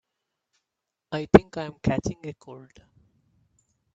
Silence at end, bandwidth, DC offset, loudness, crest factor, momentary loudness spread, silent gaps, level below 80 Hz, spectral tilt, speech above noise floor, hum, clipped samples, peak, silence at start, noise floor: 1.35 s; 8.4 kHz; under 0.1%; -24 LUFS; 28 dB; 23 LU; none; -50 dBFS; -7 dB/octave; 60 dB; none; under 0.1%; 0 dBFS; 1.1 s; -85 dBFS